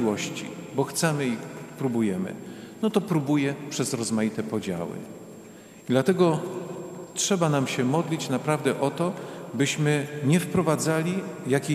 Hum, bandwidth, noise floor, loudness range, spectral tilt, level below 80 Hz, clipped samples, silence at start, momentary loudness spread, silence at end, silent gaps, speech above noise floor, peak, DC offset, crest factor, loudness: none; 15 kHz; -46 dBFS; 3 LU; -5 dB/octave; -66 dBFS; under 0.1%; 0 s; 14 LU; 0 s; none; 21 dB; -8 dBFS; under 0.1%; 18 dB; -26 LUFS